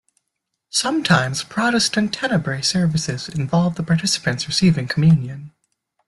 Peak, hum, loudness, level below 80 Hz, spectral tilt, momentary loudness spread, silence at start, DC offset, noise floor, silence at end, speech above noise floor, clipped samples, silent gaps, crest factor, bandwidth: -2 dBFS; none; -19 LUFS; -52 dBFS; -4.5 dB/octave; 7 LU; 0.75 s; under 0.1%; -78 dBFS; 0.6 s; 59 dB; under 0.1%; none; 18 dB; 12 kHz